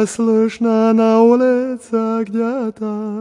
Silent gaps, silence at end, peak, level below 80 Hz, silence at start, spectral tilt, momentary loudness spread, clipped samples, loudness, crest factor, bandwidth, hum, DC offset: none; 0 s; 0 dBFS; -64 dBFS; 0 s; -6.5 dB/octave; 11 LU; under 0.1%; -16 LUFS; 14 dB; 11 kHz; none; under 0.1%